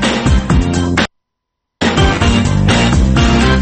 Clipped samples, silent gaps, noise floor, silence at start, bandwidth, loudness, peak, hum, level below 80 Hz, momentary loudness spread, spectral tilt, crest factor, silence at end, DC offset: under 0.1%; none; -76 dBFS; 0 s; 8.8 kHz; -12 LUFS; 0 dBFS; none; -18 dBFS; 5 LU; -5.5 dB/octave; 12 dB; 0 s; under 0.1%